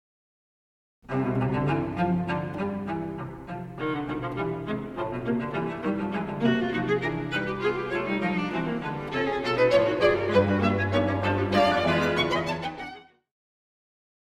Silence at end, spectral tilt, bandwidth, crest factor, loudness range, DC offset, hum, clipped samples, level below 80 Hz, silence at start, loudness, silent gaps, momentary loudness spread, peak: 1.3 s; -7 dB/octave; 13.5 kHz; 18 dB; 7 LU; under 0.1%; none; under 0.1%; -52 dBFS; 1.1 s; -26 LUFS; none; 10 LU; -8 dBFS